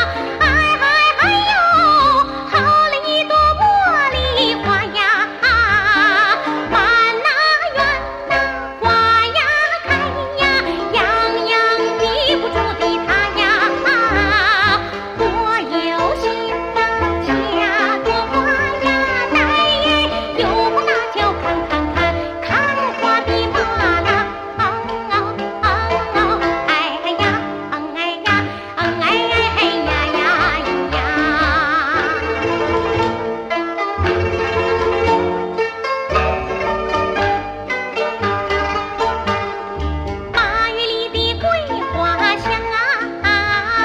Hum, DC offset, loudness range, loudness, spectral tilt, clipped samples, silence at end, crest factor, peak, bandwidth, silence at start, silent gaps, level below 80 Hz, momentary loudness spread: none; under 0.1%; 5 LU; -16 LUFS; -4.5 dB/octave; under 0.1%; 0 s; 14 dB; -2 dBFS; 14 kHz; 0 s; none; -34 dBFS; 8 LU